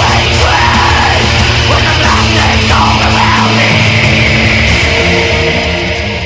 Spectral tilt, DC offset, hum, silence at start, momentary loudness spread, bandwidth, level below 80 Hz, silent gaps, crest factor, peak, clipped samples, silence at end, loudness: -4.5 dB/octave; under 0.1%; none; 0 s; 2 LU; 8 kHz; -18 dBFS; none; 8 dB; 0 dBFS; 0.7%; 0 s; -8 LUFS